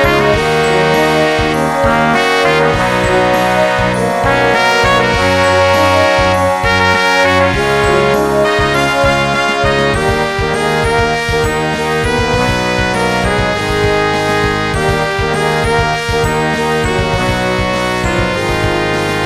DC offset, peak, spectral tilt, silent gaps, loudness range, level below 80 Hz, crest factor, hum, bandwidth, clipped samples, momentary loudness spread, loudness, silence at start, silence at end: 0.2%; 0 dBFS; -4.5 dB/octave; none; 3 LU; -28 dBFS; 12 dB; none; 16.5 kHz; 0.1%; 4 LU; -12 LUFS; 0 s; 0 s